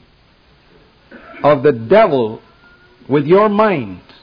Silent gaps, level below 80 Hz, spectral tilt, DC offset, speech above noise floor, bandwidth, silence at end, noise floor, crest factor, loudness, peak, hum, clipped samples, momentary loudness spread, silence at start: none; -52 dBFS; -9.5 dB/octave; under 0.1%; 38 dB; 5.2 kHz; 0.25 s; -51 dBFS; 14 dB; -13 LUFS; -2 dBFS; none; under 0.1%; 12 LU; 1.1 s